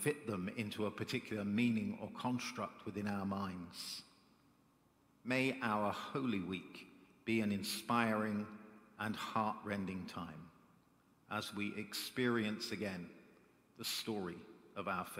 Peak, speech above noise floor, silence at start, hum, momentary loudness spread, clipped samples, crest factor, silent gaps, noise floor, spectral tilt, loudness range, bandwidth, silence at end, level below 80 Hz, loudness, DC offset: -18 dBFS; 32 dB; 0 s; none; 13 LU; under 0.1%; 22 dB; none; -72 dBFS; -5 dB/octave; 5 LU; 16 kHz; 0 s; -78 dBFS; -40 LUFS; under 0.1%